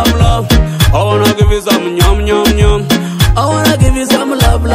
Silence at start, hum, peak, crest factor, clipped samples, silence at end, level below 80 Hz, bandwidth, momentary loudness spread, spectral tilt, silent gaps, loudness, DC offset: 0 s; none; 0 dBFS; 10 dB; 1%; 0 s; -14 dBFS; 16.5 kHz; 2 LU; -5 dB/octave; none; -10 LUFS; under 0.1%